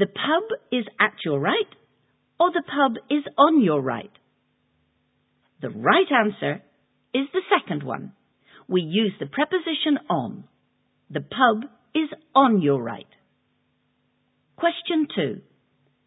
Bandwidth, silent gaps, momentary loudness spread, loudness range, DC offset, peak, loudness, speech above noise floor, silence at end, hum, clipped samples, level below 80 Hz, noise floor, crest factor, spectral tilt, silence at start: 4 kHz; none; 15 LU; 4 LU; under 0.1%; -2 dBFS; -23 LUFS; 47 dB; 0.65 s; none; under 0.1%; -72 dBFS; -69 dBFS; 22 dB; -10 dB/octave; 0 s